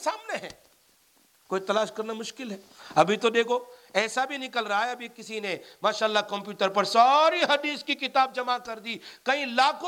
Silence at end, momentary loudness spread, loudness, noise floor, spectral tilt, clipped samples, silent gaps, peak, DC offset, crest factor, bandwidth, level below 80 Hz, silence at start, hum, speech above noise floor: 0 s; 14 LU; -26 LUFS; -63 dBFS; -3 dB/octave; under 0.1%; none; -6 dBFS; under 0.1%; 20 dB; 17 kHz; -76 dBFS; 0 s; none; 37 dB